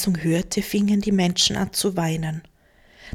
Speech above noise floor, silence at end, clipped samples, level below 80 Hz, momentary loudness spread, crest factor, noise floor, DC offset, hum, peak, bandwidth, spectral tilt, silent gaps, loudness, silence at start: 33 dB; 0 s; under 0.1%; -46 dBFS; 8 LU; 16 dB; -55 dBFS; under 0.1%; none; -6 dBFS; 17 kHz; -4.5 dB/octave; none; -22 LUFS; 0 s